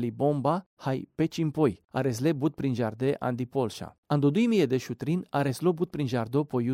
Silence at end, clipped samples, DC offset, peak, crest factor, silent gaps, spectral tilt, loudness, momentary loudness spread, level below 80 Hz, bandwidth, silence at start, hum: 0 s; under 0.1%; under 0.1%; -12 dBFS; 16 dB; 0.66-0.77 s, 3.98-4.03 s; -7.5 dB/octave; -28 LUFS; 7 LU; -64 dBFS; 16 kHz; 0 s; none